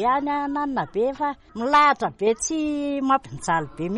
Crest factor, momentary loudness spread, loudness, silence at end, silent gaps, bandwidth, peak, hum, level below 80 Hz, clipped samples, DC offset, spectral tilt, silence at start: 16 dB; 8 LU; -23 LUFS; 0 s; none; 11.5 kHz; -8 dBFS; none; -52 dBFS; under 0.1%; under 0.1%; -4 dB/octave; 0 s